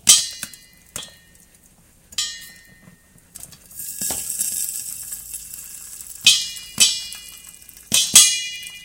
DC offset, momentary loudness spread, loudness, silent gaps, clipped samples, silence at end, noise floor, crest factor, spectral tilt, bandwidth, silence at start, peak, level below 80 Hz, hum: under 0.1%; 25 LU; -17 LUFS; none; under 0.1%; 0 s; -53 dBFS; 22 dB; 2 dB/octave; 17 kHz; 0.05 s; 0 dBFS; -56 dBFS; none